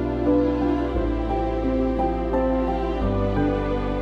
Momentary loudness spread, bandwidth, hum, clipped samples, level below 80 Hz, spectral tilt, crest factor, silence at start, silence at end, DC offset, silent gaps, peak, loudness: 4 LU; 6.4 kHz; none; under 0.1%; -30 dBFS; -9 dB/octave; 12 dB; 0 s; 0 s; under 0.1%; none; -10 dBFS; -23 LUFS